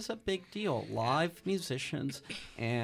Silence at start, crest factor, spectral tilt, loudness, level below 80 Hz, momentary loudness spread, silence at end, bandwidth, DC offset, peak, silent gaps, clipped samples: 0 s; 16 dB; -5 dB/octave; -35 LUFS; -62 dBFS; 7 LU; 0 s; 15.5 kHz; under 0.1%; -18 dBFS; none; under 0.1%